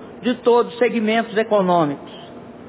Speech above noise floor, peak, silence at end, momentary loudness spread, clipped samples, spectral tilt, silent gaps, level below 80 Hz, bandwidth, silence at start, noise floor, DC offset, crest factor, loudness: 20 dB; -6 dBFS; 0 s; 19 LU; under 0.1%; -10 dB/octave; none; -62 dBFS; 4 kHz; 0 s; -38 dBFS; under 0.1%; 14 dB; -18 LUFS